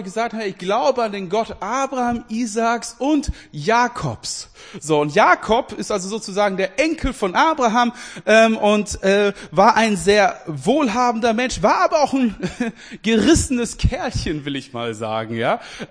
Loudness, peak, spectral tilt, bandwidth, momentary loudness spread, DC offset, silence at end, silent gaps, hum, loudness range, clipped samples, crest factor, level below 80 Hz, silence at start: -19 LUFS; 0 dBFS; -4.5 dB/octave; 10.5 kHz; 11 LU; under 0.1%; 0.05 s; none; none; 5 LU; under 0.1%; 18 dB; -36 dBFS; 0 s